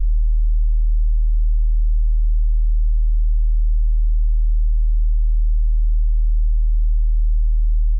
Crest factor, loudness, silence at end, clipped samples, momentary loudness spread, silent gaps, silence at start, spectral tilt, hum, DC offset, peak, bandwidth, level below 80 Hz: 4 dB; -21 LUFS; 0 s; under 0.1%; 0 LU; none; 0 s; -13.5 dB/octave; none; under 0.1%; -12 dBFS; 0.2 kHz; -14 dBFS